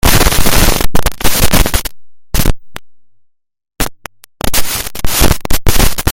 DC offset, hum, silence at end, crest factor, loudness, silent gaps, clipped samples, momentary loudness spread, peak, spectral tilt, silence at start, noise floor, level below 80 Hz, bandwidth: under 0.1%; none; 0 s; 10 dB; -13 LUFS; none; 2%; 17 LU; 0 dBFS; -3 dB/octave; 0.05 s; -50 dBFS; -16 dBFS; over 20 kHz